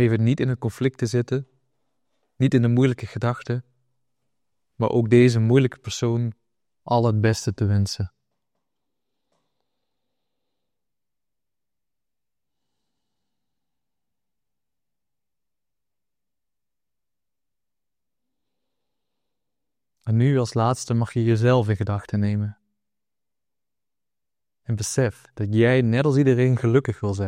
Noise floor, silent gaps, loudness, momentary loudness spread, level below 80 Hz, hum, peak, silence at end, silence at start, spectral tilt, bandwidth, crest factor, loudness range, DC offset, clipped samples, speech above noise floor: -90 dBFS; none; -22 LUFS; 10 LU; -60 dBFS; none; -4 dBFS; 0 s; 0 s; -7 dB/octave; 11.5 kHz; 20 dB; 9 LU; under 0.1%; under 0.1%; 70 dB